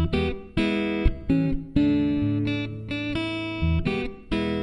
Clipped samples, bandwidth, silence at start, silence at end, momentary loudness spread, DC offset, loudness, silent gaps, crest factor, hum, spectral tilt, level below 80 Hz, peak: under 0.1%; 10.5 kHz; 0 s; 0 s; 7 LU; under 0.1%; -26 LUFS; none; 18 dB; none; -8 dB/octave; -34 dBFS; -6 dBFS